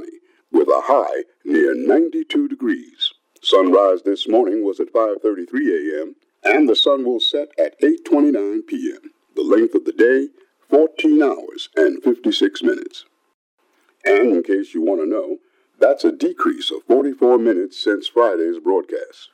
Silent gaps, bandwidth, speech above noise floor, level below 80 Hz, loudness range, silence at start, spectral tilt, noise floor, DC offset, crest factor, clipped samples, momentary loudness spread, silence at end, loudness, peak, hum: 13.34-13.58 s; 10 kHz; 24 dB; -86 dBFS; 2 LU; 0 s; -3.5 dB/octave; -41 dBFS; under 0.1%; 16 dB; under 0.1%; 10 LU; 0.1 s; -18 LUFS; -2 dBFS; none